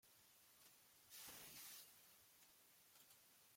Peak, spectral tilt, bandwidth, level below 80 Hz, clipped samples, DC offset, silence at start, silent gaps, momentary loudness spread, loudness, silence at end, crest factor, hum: -46 dBFS; 0 dB/octave; 16.5 kHz; under -90 dBFS; under 0.1%; under 0.1%; 0.05 s; none; 12 LU; -62 LUFS; 0 s; 20 dB; none